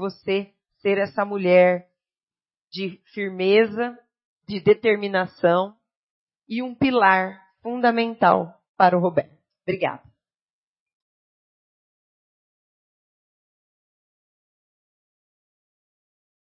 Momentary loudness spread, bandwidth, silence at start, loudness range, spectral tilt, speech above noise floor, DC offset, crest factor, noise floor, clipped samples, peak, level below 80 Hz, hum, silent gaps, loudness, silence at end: 14 LU; 5.8 kHz; 0 s; 6 LU; -10 dB/octave; over 69 dB; under 0.1%; 24 dB; under -90 dBFS; under 0.1%; -2 dBFS; -68 dBFS; none; 2.23-2.28 s, 2.61-2.65 s, 4.25-4.40 s, 5.96-6.27 s, 8.69-8.74 s; -21 LUFS; 6.6 s